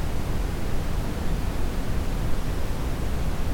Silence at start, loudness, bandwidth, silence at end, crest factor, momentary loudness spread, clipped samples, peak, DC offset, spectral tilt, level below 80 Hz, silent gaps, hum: 0 s; -30 LUFS; 17 kHz; 0 s; 12 dB; 1 LU; under 0.1%; -12 dBFS; under 0.1%; -6 dB/octave; -28 dBFS; none; none